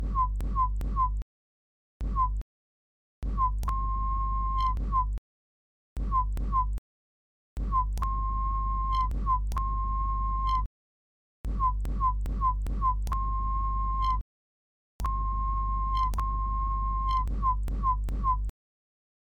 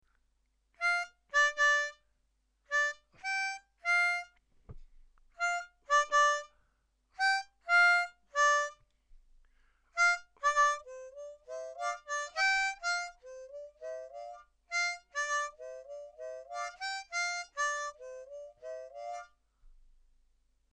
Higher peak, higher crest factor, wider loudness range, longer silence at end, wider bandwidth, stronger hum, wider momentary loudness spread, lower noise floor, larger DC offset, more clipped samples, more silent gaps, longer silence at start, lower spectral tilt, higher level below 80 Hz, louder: about the same, -16 dBFS vs -18 dBFS; about the same, 12 dB vs 16 dB; second, 3 LU vs 9 LU; second, 0.8 s vs 1 s; second, 6.2 kHz vs 11 kHz; first, 50 Hz at -40 dBFS vs none; second, 9 LU vs 20 LU; first, under -90 dBFS vs -76 dBFS; neither; neither; first, 1.22-2.00 s, 2.42-3.22 s, 5.18-5.96 s, 6.78-7.57 s, 10.66-11.44 s, 14.21-14.99 s vs none; second, 0 s vs 0.8 s; first, -7 dB/octave vs 2 dB/octave; first, -32 dBFS vs -66 dBFS; about the same, -30 LUFS vs -31 LUFS